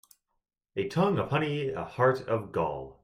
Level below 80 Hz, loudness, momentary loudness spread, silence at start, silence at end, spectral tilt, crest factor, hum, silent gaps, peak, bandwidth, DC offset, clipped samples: -60 dBFS; -29 LUFS; 8 LU; 0.75 s; 0.1 s; -7.5 dB/octave; 20 dB; none; none; -10 dBFS; 15 kHz; under 0.1%; under 0.1%